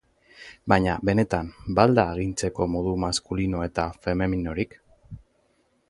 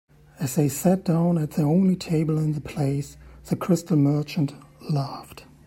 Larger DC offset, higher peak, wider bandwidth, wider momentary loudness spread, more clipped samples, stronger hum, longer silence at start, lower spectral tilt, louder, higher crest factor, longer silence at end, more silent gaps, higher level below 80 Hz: neither; first, -2 dBFS vs -8 dBFS; second, 11.5 kHz vs 16 kHz; about the same, 10 LU vs 11 LU; neither; neither; about the same, 0.4 s vs 0.4 s; about the same, -6 dB/octave vs -7 dB/octave; about the same, -25 LUFS vs -24 LUFS; first, 24 dB vs 16 dB; first, 0.7 s vs 0.25 s; neither; first, -42 dBFS vs -54 dBFS